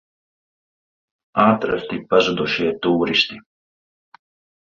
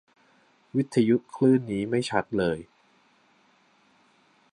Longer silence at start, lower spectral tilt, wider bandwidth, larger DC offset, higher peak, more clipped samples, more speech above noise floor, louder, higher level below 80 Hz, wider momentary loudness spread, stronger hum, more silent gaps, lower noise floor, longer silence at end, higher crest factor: first, 1.35 s vs 0.75 s; second, -5.5 dB/octave vs -7 dB/octave; second, 7.4 kHz vs 11.5 kHz; neither; first, -2 dBFS vs -8 dBFS; neither; first, over 71 dB vs 39 dB; first, -19 LUFS vs -26 LUFS; first, -56 dBFS vs -62 dBFS; about the same, 8 LU vs 7 LU; neither; neither; first, under -90 dBFS vs -63 dBFS; second, 1.3 s vs 1.9 s; about the same, 20 dB vs 20 dB